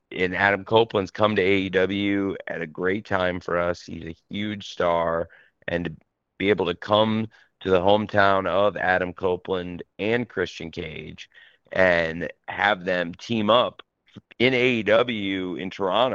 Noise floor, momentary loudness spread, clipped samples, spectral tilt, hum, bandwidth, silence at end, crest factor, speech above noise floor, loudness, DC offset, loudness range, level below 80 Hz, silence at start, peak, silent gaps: -50 dBFS; 14 LU; under 0.1%; -6 dB/octave; none; 7.4 kHz; 0 s; 22 dB; 26 dB; -23 LUFS; under 0.1%; 4 LU; -56 dBFS; 0.1 s; -2 dBFS; none